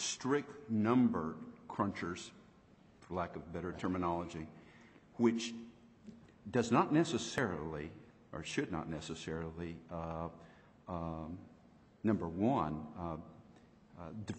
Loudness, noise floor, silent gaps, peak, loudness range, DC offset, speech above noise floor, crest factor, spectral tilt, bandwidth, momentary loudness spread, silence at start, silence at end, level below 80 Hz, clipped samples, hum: -38 LUFS; -64 dBFS; none; -16 dBFS; 7 LU; under 0.1%; 27 dB; 22 dB; -5.5 dB/octave; 8.4 kHz; 20 LU; 0 s; 0 s; -62 dBFS; under 0.1%; none